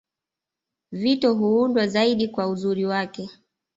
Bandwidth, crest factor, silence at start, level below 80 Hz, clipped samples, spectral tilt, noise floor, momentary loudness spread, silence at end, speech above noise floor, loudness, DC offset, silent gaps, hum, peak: 8 kHz; 16 dB; 0.9 s; -66 dBFS; under 0.1%; -6 dB/octave; -87 dBFS; 14 LU; 0.45 s; 66 dB; -22 LUFS; under 0.1%; none; none; -8 dBFS